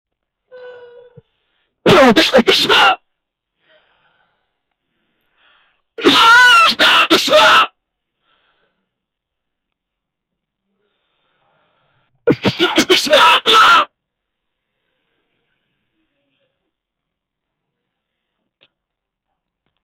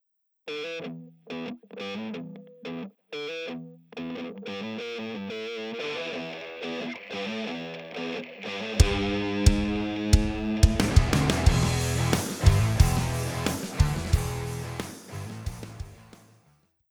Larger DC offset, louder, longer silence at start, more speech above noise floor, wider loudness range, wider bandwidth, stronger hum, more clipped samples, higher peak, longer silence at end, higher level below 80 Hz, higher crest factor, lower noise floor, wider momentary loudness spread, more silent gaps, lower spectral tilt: neither; first, -10 LUFS vs -28 LUFS; first, 0.6 s vs 0.45 s; first, 69 dB vs 27 dB; about the same, 11 LU vs 13 LU; second, 17 kHz vs 19.5 kHz; neither; neither; first, 0 dBFS vs -4 dBFS; first, 6.15 s vs 0.85 s; second, -52 dBFS vs -32 dBFS; second, 16 dB vs 24 dB; first, -79 dBFS vs -65 dBFS; second, 11 LU vs 16 LU; neither; second, -3 dB/octave vs -5.5 dB/octave